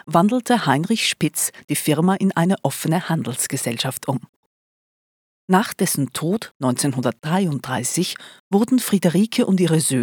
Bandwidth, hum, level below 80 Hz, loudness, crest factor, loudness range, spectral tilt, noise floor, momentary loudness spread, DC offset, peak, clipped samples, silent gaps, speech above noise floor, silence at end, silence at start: over 20 kHz; none; -66 dBFS; -20 LUFS; 20 dB; 4 LU; -4.5 dB/octave; under -90 dBFS; 6 LU; under 0.1%; -2 dBFS; under 0.1%; 1.64-1.68 s, 4.29-5.48 s, 6.51-6.60 s, 8.40-8.51 s; over 70 dB; 0 s; 0.05 s